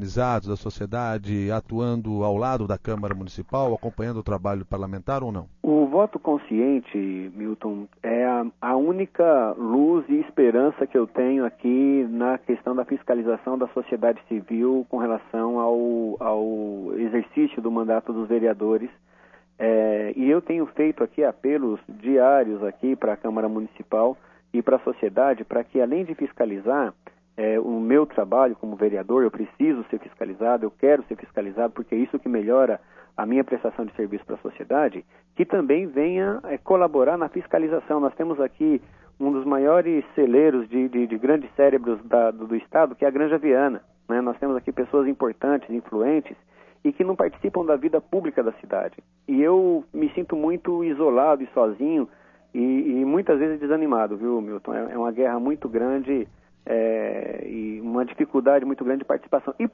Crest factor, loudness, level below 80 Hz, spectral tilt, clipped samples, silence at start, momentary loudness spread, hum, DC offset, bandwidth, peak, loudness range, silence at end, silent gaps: 18 dB; -23 LUFS; -54 dBFS; -9 dB/octave; under 0.1%; 0 s; 10 LU; none; under 0.1%; 7 kHz; -4 dBFS; 4 LU; 0.05 s; none